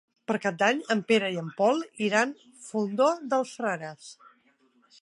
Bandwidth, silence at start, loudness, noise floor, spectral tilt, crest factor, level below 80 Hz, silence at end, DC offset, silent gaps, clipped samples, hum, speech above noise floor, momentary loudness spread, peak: 11.5 kHz; 0.3 s; -27 LUFS; -66 dBFS; -4.5 dB/octave; 20 dB; -82 dBFS; 0.9 s; under 0.1%; none; under 0.1%; none; 38 dB; 11 LU; -8 dBFS